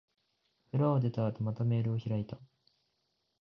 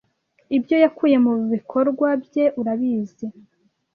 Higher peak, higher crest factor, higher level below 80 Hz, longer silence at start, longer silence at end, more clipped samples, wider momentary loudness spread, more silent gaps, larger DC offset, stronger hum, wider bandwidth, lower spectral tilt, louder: second, -16 dBFS vs -4 dBFS; about the same, 18 dB vs 18 dB; about the same, -66 dBFS vs -68 dBFS; first, 0.75 s vs 0.5 s; first, 0.95 s vs 0.65 s; neither; about the same, 9 LU vs 9 LU; neither; neither; neither; first, 5.8 kHz vs 4.8 kHz; first, -11 dB/octave vs -8 dB/octave; second, -33 LUFS vs -20 LUFS